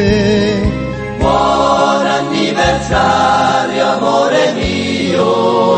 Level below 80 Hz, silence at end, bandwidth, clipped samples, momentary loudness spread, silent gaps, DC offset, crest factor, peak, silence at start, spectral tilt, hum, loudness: -30 dBFS; 0 s; 8.8 kHz; under 0.1%; 5 LU; none; under 0.1%; 12 dB; 0 dBFS; 0 s; -5 dB/octave; none; -13 LUFS